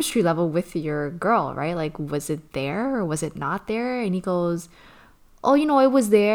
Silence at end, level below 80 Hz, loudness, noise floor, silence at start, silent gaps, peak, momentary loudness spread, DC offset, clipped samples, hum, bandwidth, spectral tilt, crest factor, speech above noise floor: 0 s; -52 dBFS; -23 LUFS; -52 dBFS; 0 s; none; -4 dBFS; 10 LU; under 0.1%; under 0.1%; none; 19 kHz; -5.5 dB/octave; 18 dB; 29 dB